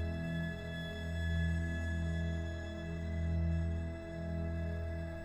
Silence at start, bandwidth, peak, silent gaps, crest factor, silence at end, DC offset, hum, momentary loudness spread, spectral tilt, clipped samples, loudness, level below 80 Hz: 0 s; 8.4 kHz; -24 dBFS; none; 12 dB; 0 s; under 0.1%; none; 6 LU; -7.5 dB/octave; under 0.1%; -39 LUFS; -46 dBFS